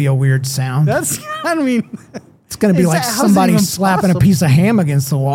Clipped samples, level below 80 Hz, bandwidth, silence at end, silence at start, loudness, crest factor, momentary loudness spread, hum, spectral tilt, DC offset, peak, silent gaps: under 0.1%; -44 dBFS; 17 kHz; 0 s; 0 s; -14 LUFS; 12 dB; 8 LU; none; -6 dB/octave; under 0.1%; -2 dBFS; none